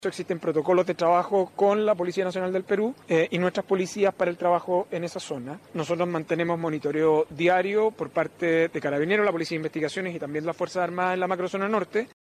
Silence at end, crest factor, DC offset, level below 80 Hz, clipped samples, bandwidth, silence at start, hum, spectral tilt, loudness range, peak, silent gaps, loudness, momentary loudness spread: 0.2 s; 14 dB; under 0.1%; -70 dBFS; under 0.1%; 14 kHz; 0 s; none; -6 dB/octave; 3 LU; -10 dBFS; none; -25 LUFS; 8 LU